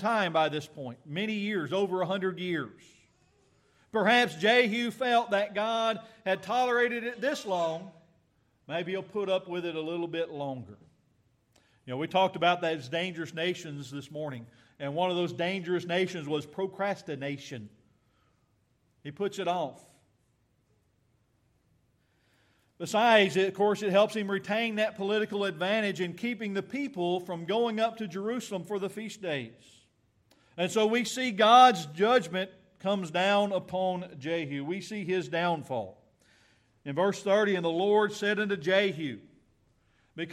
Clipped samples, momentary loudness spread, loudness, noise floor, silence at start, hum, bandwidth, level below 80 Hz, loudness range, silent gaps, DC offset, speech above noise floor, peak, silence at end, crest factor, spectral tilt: under 0.1%; 14 LU; -29 LUFS; -71 dBFS; 0 s; none; 15 kHz; -78 dBFS; 11 LU; none; under 0.1%; 42 dB; -8 dBFS; 0 s; 24 dB; -4.5 dB/octave